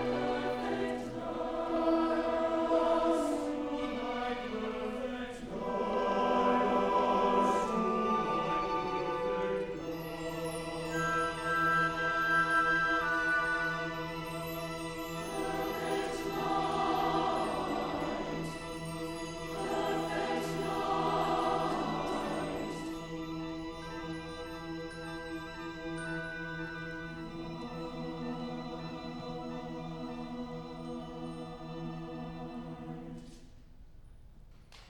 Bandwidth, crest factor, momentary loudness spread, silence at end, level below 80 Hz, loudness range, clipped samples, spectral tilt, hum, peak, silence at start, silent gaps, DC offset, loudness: 18 kHz; 18 dB; 13 LU; 0 s; -54 dBFS; 12 LU; under 0.1%; -5 dB/octave; none; -16 dBFS; 0 s; none; under 0.1%; -34 LUFS